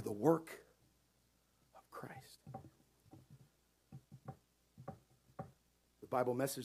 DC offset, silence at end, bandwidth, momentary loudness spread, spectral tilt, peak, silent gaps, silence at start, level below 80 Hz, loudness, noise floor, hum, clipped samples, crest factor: under 0.1%; 0 s; 15.5 kHz; 27 LU; -6 dB/octave; -18 dBFS; none; 0 s; -78 dBFS; -39 LUFS; -76 dBFS; none; under 0.1%; 28 dB